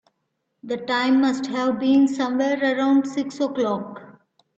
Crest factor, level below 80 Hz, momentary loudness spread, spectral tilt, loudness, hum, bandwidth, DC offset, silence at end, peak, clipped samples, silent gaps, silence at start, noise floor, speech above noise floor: 12 dB; -66 dBFS; 11 LU; -5 dB/octave; -21 LUFS; none; 8 kHz; under 0.1%; 0.45 s; -10 dBFS; under 0.1%; none; 0.65 s; -75 dBFS; 54 dB